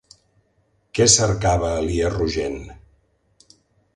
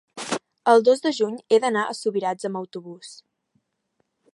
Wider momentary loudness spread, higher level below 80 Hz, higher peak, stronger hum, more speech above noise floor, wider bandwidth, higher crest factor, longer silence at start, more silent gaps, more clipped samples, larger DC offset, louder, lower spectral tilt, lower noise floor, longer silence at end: second, 15 LU vs 20 LU; first, -36 dBFS vs -80 dBFS; about the same, -2 dBFS vs -2 dBFS; neither; second, 45 dB vs 51 dB; about the same, 11.5 kHz vs 11.5 kHz; about the same, 22 dB vs 20 dB; first, 0.95 s vs 0.15 s; neither; neither; neither; first, -19 LUFS vs -22 LUFS; about the same, -3.5 dB/octave vs -4 dB/octave; second, -65 dBFS vs -73 dBFS; about the same, 1.2 s vs 1.2 s